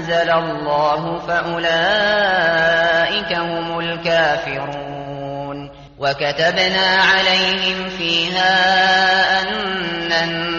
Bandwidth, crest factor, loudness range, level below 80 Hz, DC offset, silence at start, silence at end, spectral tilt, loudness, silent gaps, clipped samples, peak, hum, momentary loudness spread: 7.2 kHz; 14 dB; 6 LU; -48 dBFS; under 0.1%; 0 s; 0 s; -0.5 dB/octave; -16 LUFS; none; under 0.1%; -2 dBFS; none; 12 LU